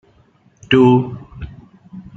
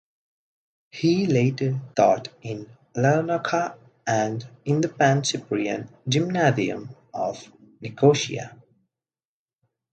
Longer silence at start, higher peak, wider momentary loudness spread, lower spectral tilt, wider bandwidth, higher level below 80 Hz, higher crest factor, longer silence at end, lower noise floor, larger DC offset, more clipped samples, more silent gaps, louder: second, 0.7 s vs 0.95 s; first, 0 dBFS vs -4 dBFS; first, 23 LU vs 15 LU; first, -8 dB/octave vs -5.5 dB/octave; second, 7.6 kHz vs 9 kHz; first, -44 dBFS vs -66 dBFS; about the same, 18 dB vs 20 dB; second, 0.15 s vs 1.45 s; second, -54 dBFS vs under -90 dBFS; neither; neither; neither; first, -13 LUFS vs -23 LUFS